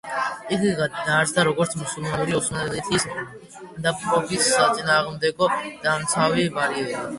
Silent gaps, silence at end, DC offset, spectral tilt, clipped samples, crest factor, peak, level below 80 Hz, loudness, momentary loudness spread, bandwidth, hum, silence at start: none; 0 s; under 0.1%; -3.5 dB/octave; under 0.1%; 18 dB; -6 dBFS; -54 dBFS; -22 LUFS; 8 LU; 12 kHz; none; 0.05 s